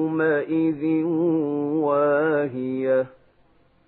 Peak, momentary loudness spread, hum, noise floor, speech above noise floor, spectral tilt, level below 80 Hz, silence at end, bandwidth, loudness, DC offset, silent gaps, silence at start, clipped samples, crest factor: -10 dBFS; 4 LU; none; -59 dBFS; 37 dB; -12 dB/octave; -70 dBFS; 0.8 s; 4.1 kHz; -22 LUFS; under 0.1%; none; 0 s; under 0.1%; 14 dB